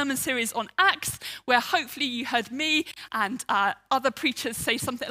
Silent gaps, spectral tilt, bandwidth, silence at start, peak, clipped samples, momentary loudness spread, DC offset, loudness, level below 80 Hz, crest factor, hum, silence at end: none; -2 dB/octave; 16 kHz; 0 s; -4 dBFS; under 0.1%; 6 LU; under 0.1%; -26 LUFS; -62 dBFS; 22 dB; none; 0 s